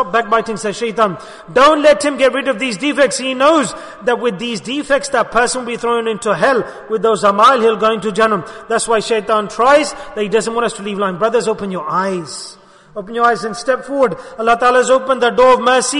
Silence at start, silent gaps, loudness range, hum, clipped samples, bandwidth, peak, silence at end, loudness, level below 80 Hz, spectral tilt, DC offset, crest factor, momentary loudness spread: 0 s; none; 5 LU; none; under 0.1%; 11 kHz; -2 dBFS; 0 s; -14 LUFS; -48 dBFS; -3.5 dB/octave; under 0.1%; 14 dB; 11 LU